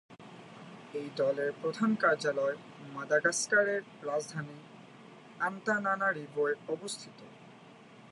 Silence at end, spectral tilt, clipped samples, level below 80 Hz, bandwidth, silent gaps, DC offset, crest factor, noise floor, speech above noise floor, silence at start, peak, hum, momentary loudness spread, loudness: 0.05 s; -4 dB/octave; under 0.1%; -84 dBFS; 11.5 kHz; none; under 0.1%; 20 dB; -54 dBFS; 22 dB; 0.1 s; -14 dBFS; none; 24 LU; -32 LUFS